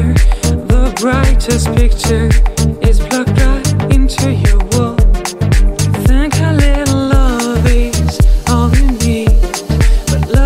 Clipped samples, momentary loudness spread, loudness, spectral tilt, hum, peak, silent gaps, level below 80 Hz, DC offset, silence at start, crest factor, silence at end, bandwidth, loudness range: under 0.1%; 2 LU; -13 LUFS; -5.5 dB/octave; none; 0 dBFS; none; -12 dBFS; under 0.1%; 0 s; 10 dB; 0 s; 15.5 kHz; 1 LU